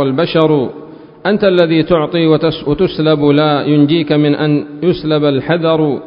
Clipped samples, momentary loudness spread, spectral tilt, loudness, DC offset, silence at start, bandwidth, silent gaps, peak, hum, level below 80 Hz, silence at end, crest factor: under 0.1%; 5 LU; -10 dB/octave; -12 LUFS; under 0.1%; 0 s; 5.4 kHz; none; 0 dBFS; none; -44 dBFS; 0 s; 12 dB